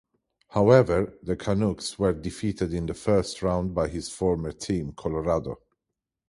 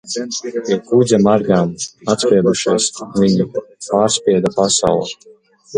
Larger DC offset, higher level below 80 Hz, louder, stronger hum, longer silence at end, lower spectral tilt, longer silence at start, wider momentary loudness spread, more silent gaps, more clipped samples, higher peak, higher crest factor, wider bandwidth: neither; first, -44 dBFS vs -50 dBFS; second, -26 LUFS vs -15 LUFS; neither; first, 0.75 s vs 0 s; first, -6.5 dB/octave vs -4.5 dB/octave; first, 0.55 s vs 0.05 s; about the same, 11 LU vs 9 LU; neither; neither; second, -4 dBFS vs 0 dBFS; first, 22 dB vs 16 dB; about the same, 11.5 kHz vs 11 kHz